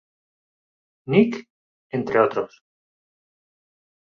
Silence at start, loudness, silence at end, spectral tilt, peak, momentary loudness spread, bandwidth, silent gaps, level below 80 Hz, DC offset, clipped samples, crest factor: 1.05 s; -22 LUFS; 1.7 s; -8 dB/octave; -2 dBFS; 16 LU; 6.8 kHz; 1.50-1.90 s; -66 dBFS; under 0.1%; under 0.1%; 24 dB